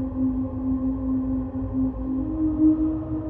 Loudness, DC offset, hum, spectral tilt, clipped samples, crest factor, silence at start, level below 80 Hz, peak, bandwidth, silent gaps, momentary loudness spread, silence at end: -25 LUFS; under 0.1%; none; -13.5 dB/octave; under 0.1%; 14 dB; 0 s; -36 dBFS; -10 dBFS; 2.5 kHz; none; 7 LU; 0 s